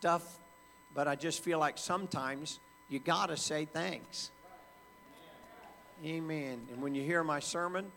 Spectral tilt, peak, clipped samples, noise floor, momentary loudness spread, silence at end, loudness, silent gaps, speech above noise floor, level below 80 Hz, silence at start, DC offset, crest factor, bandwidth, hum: -3.5 dB/octave; -16 dBFS; under 0.1%; -60 dBFS; 22 LU; 0 s; -36 LUFS; none; 24 dB; -74 dBFS; 0 s; under 0.1%; 22 dB; 19 kHz; none